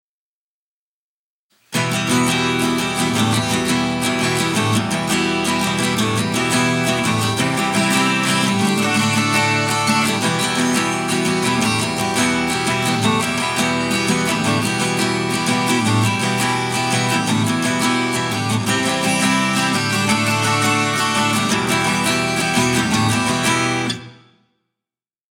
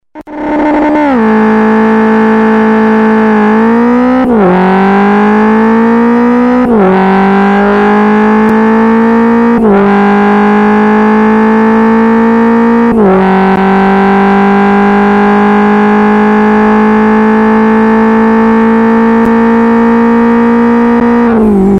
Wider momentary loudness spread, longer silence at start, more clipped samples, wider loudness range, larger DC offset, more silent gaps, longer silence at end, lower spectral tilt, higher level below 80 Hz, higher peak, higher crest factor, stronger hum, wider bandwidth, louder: about the same, 3 LU vs 1 LU; first, 1.7 s vs 0.15 s; neither; about the same, 2 LU vs 0 LU; second, under 0.1% vs 0.2%; neither; first, 1.15 s vs 0 s; second, -3.5 dB/octave vs -8.5 dB/octave; second, -50 dBFS vs -34 dBFS; second, -4 dBFS vs 0 dBFS; first, 14 dB vs 6 dB; neither; first, 18 kHz vs 6.2 kHz; second, -17 LUFS vs -6 LUFS